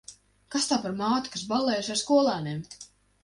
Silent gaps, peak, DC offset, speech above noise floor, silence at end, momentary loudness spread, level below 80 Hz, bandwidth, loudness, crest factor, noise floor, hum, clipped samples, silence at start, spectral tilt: none; -12 dBFS; under 0.1%; 23 dB; 0.4 s; 13 LU; -64 dBFS; 11.5 kHz; -27 LUFS; 18 dB; -50 dBFS; none; under 0.1%; 0.1 s; -4 dB/octave